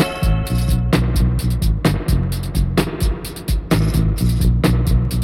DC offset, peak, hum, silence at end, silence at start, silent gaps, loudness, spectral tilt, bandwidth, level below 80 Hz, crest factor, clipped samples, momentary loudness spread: under 0.1%; -6 dBFS; none; 0 s; 0 s; none; -18 LUFS; -6.5 dB/octave; 16.5 kHz; -20 dBFS; 10 dB; under 0.1%; 5 LU